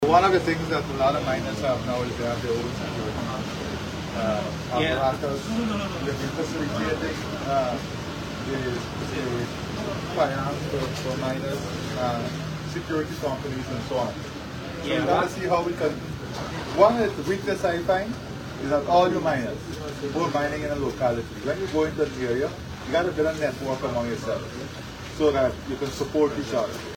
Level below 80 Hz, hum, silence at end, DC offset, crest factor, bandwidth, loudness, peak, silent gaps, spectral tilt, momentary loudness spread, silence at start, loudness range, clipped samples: -46 dBFS; none; 0 s; under 0.1%; 22 dB; 18 kHz; -26 LUFS; -4 dBFS; none; -5.5 dB/octave; 9 LU; 0 s; 4 LU; under 0.1%